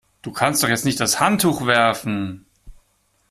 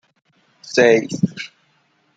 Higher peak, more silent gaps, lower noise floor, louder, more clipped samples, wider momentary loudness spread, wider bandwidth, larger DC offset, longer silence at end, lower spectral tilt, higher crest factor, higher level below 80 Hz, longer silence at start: about the same, -2 dBFS vs 0 dBFS; neither; about the same, -64 dBFS vs -62 dBFS; about the same, -18 LUFS vs -17 LUFS; neither; second, 10 LU vs 19 LU; first, 16 kHz vs 8.6 kHz; neither; second, 0.55 s vs 0.7 s; second, -3.5 dB/octave vs -5 dB/octave; about the same, 20 dB vs 20 dB; first, -52 dBFS vs -60 dBFS; second, 0.25 s vs 0.65 s